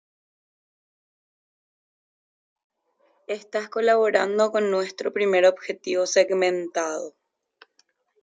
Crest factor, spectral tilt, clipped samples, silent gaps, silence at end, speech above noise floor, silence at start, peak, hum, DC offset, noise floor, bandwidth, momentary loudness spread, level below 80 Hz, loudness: 20 dB; -3 dB/octave; under 0.1%; none; 1.15 s; 45 dB; 3.3 s; -6 dBFS; none; under 0.1%; -67 dBFS; 9.4 kHz; 13 LU; -80 dBFS; -23 LUFS